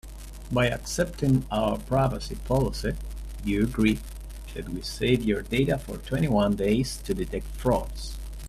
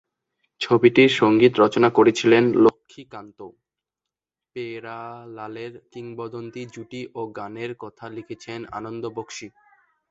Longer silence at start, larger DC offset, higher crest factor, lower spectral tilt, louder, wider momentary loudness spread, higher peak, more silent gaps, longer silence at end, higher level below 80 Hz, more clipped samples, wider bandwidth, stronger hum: second, 0.05 s vs 0.6 s; neither; about the same, 18 dB vs 20 dB; about the same, -6 dB/octave vs -5.5 dB/octave; second, -27 LUFS vs -18 LUFS; second, 14 LU vs 21 LU; second, -8 dBFS vs -2 dBFS; neither; second, 0 s vs 0.6 s; first, -36 dBFS vs -62 dBFS; neither; first, 15 kHz vs 7.8 kHz; neither